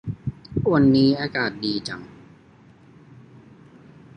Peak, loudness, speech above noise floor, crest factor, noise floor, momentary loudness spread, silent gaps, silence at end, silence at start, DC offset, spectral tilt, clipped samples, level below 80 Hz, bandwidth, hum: -6 dBFS; -22 LUFS; 31 dB; 18 dB; -51 dBFS; 16 LU; none; 2.1 s; 0.05 s; under 0.1%; -7 dB/octave; under 0.1%; -50 dBFS; 9.8 kHz; none